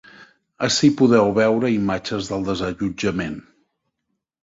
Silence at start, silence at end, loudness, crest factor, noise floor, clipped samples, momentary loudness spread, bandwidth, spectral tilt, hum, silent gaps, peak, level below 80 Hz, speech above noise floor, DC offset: 0.2 s; 1 s; -20 LUFS; 18 dB; -77 dBFS; under 0.1%; 10 LU; 7.8 kHz; -5 dB/octave; none; none; -2 dBFS; -50 dBFS; 58 dB; under 0.1%